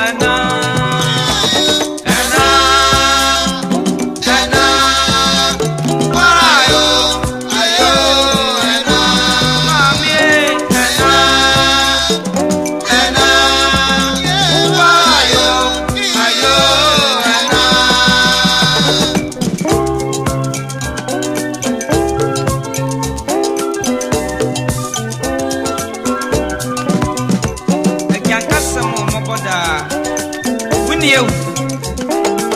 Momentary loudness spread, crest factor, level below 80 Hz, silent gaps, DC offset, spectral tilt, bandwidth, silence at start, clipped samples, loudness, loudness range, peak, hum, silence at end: 10 LU; 12 dB; -32 dBFS; none; under 0.1%; -3 dB/octave; 16 kHz; 0 s; under 0.1%; -11 LUFS; 7 LU; 0 dBFS; none; 0 s